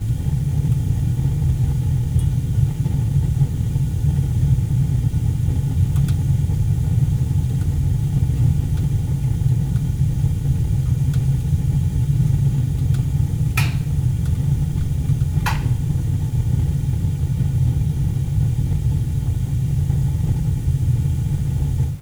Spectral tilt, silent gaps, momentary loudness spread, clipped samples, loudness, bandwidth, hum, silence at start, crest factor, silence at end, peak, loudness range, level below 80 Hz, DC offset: -7.5 dB/octave; none; 3 LU; under 0.1%; -20 LUFS; over 20 kHz; none; 0 s; 14 dB; 0 s; -4 dBFS; 1 LU; -26 dBFS; under 0.1%